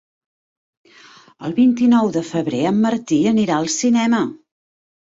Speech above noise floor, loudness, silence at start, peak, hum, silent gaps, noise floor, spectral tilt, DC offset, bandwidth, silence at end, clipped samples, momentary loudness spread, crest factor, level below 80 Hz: 30 dB; -17 LUFS; 1.4 s; -6 dBFS; none; none; -46 dBFS; -5 dB/octave; under 0.1%; 8 kHz; 0.75 s; under 0.1%; 7 LU; 14 dB; -60 dBFS